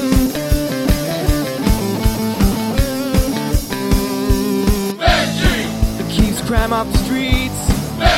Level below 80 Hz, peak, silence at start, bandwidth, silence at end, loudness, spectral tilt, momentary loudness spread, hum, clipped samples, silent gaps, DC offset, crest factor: -20 dBFS; 0 dBFS; 0 s; 16.5 kHz; 0 s; -17 LUFS; -5 dB/octave; 3 LU; none; under 0.1%; none; 0.4%; 16 dB